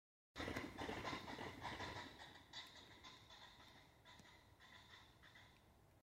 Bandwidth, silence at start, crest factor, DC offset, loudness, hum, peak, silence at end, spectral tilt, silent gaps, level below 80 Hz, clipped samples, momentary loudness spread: 16 kHz; 0.35 s; 24 dB; under 0.1%; -53 LUFS; none; -30 dBFS; 0 s; -4 dB/octave; none; -72 dBFS; under 0.1%; 16 LU